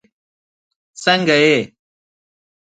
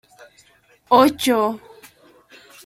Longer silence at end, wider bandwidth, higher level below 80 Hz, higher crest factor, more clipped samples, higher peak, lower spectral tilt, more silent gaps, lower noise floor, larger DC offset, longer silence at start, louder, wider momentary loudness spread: about the same, 1.05 s vs 1.1 s; second, 9.4 kHz vs 16.5 kHz; second, -66 dBFS vs -60 dBFS; about the same, 20 dB vs 20 dB; neither; about the same, 0 dBFS vs -2 dBFS; about the same, -4 dB/octave vs -3.5 dB/octave; neither; first, under -90 dBFS vs -55 dBFS; neither; about the same, 1 s vs 0.9 s; about the same, -15 LUFS vs -17 LUFS; about the same, 10 LU vs 11 LU